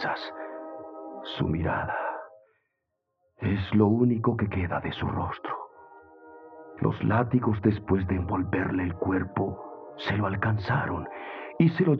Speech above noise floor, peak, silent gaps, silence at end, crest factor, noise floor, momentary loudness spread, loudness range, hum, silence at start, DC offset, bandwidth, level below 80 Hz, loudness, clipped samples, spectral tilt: 55 dB; -8 dBFS; none; 0 s; 20 dB; -81 dBFS; 16 LU; 3 LU; none; 0 s; under 0.1%; 5.8 kHz; -56 dBFS; -28 LUFS; under 0.1%; -9.5 dB/octave